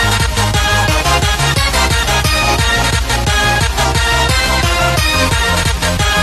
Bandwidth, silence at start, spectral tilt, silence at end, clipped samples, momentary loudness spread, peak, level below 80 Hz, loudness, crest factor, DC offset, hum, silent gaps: 13.5 kHz; 0 s; -3 dB/octave; 0 s; under 0.1%; 2 LU; 0 dBFS; -20 dBFS; -12 LUFS; 12 dB; under 0.1%; none; none